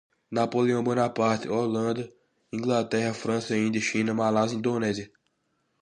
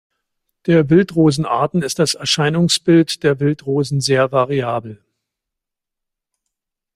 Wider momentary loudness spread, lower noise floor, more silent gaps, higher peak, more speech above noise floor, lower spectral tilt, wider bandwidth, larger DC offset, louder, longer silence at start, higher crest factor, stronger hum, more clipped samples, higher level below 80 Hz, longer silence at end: about the same, 9 LU vs 7 LU; second, -74 dBFS vs -82 dBFS; neither; second, -10 dBFS vs -2 dBFS; second, 48 dB vs 67 dB; about the same, -5.5 dB/octave vs -5 dB/octave; second, 9.8 kHz vs 15 kHz; neither; second, -27 LUFS vs -16 LUFS; second, 0.3 s vs 0.65 s; about the same, 16 dB vs 16 dB; neither; neither; second, -66 dBFS vs -54 dBFS; second, 0.75 s vs 2 s